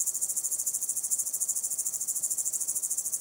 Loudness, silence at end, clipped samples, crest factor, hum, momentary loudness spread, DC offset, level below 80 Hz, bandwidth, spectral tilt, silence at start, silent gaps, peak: -28 LUFS; 0 s; under 0.1%; 20 dB; none; 1 LU; under 0.1%; -80 dBFS; 19 kHz; 1.5 dB/octave; 0 s; none; -10 dBFS